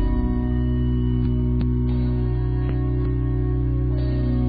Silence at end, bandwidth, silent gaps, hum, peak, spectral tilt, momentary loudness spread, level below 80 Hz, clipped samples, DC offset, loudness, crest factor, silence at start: 0 s; 4.7 kHz; none; none; -10 dBFS; -10 dB/octave; 1 LU; -24 dBFS; under 0.1%; 1%; -23 LUFS; 10 dB; 0 s